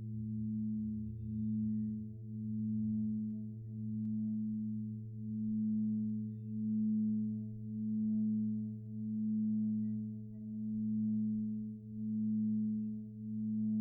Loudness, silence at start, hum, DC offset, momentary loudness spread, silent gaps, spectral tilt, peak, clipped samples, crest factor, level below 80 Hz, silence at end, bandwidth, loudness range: -38 LUFS; 0 s; none; under 0.1%; 9 LU; none; -14 dB/octave; -28 dBFS; under 0.1%; 8 dB; -66 dBFS; 0 s; 0.7 kHz; 2 LU